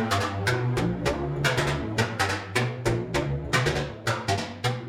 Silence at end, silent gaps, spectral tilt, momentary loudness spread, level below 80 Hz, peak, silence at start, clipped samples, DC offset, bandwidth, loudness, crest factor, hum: 0 s; none; -5 dB/octave; 4 LU; -44 dBFS; -8 dBFS; 0 s; under 0.1%; under 0.1%; 16.5 kHz; -26 LUFS; 18 dB; none